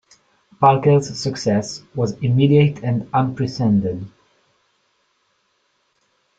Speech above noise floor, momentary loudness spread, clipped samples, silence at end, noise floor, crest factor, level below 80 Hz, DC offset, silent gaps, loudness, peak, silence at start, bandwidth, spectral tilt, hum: 49 dB; 11 LU; under 0.1%; 2.3 s; -66 dBFS; 18 dB; -54 dBFS; under 0.1%; none; -18 LUFS; -2 dBFS; 0.6 s; 8 kHz; -7 dB/octave; none